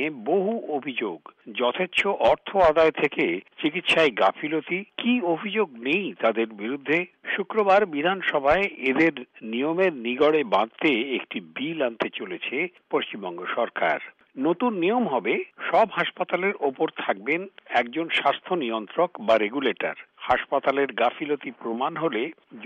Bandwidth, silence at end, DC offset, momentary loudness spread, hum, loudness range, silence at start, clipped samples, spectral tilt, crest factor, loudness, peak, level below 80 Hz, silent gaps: 9.4 kHz; 0 s; under 0.1%; 10 LU; none; 4 LU; 0 s; under 0.1%; -5.5 dB/octave; 16 dB; -24 LUFS; -8 dBFS; -58 dBFS; none